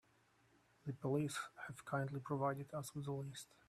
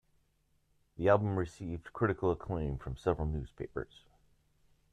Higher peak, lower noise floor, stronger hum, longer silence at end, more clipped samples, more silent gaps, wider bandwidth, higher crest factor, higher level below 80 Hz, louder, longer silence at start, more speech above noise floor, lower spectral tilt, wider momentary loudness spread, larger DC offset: second, -26 dBFS vs -14 dBFS; about the same, -74 dBFS vs -74 dBFS; neither; second, 0.25 s vs 1.1 s; neither; neither; first, 14.5 kHz vs 10 kHz; about the same, 20 dB vs 22 dB; second, -78 dBFS vs -50 dBFS; second, -44 LUFS vs -34 LUFS; second, 0.85 s vs 1 s; second, 31 dB vs 40 dB; second, -6 dB/octave vs -8.5 dB/octave; about the same, 11 LU vs 13 LU; neither